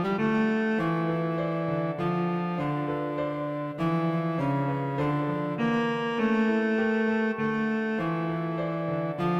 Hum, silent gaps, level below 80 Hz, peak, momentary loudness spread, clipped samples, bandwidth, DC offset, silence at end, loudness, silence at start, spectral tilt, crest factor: none; none; -60 dBFS; -14 dBFS; 5 LU; under 0.1%; 7.8 kHz; under 0.1%; 0 s; -28 LUFS; 0 s; -8.5 dB/octave; 14 dB